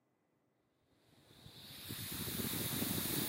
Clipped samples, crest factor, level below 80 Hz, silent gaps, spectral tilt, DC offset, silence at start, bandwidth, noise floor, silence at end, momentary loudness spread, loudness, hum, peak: under 0.1%; 18 dB; -66 dBFS; none; -3 dB/octave; under 0.1%; 1.15 s; 16 kHz; -79 dBFS; 0 s; 19 LU; -39 LUFS; none; -24 dBFS